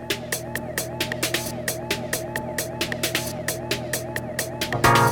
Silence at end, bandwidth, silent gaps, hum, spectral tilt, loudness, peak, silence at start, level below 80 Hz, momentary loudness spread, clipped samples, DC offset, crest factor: 0 s; over 20 kHz; none; none; -3.5 dB/octave; -25 LUFS; -4 dBFS; 0 s; -46 dBFS; 7 LU; under 0.1%; under 0.1%; 22 dB